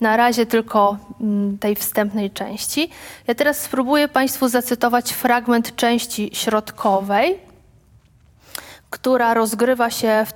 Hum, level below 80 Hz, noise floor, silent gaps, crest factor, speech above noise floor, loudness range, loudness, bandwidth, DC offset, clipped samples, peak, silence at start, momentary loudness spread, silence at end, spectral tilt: none; -56 dBFS; -52 dBFS; none; 18 dB; 34 dB; 3 LU; -19 LUFS; 19 kHz; under 0.1%; under 0.1%; -2 dBFS; 0 s; 9 LU; 0 s; -3.5 dB/octave